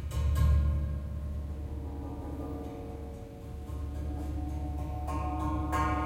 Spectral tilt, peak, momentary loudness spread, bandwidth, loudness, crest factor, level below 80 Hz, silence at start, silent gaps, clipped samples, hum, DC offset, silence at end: -7.5 dB/octave; -16 dBFS; 13 LU; 14 kHz; -35 LUFS; 16 dB; -36 dBFS; 0 s; none; under 0.1%; none; under 0.1%; 0 s